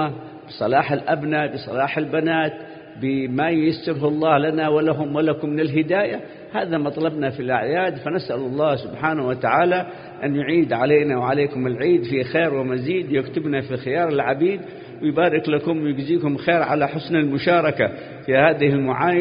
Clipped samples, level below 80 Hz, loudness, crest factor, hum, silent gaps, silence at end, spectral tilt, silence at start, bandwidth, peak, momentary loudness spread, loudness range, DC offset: under 0.1%; -60 dBFS; -21 LUFS; 18 dB; none; none; 0 s; -11.5 dB/octave; 0 s; 5.2 kHz; -2 dBFS; 7 LU; 3 LU; under 0.1%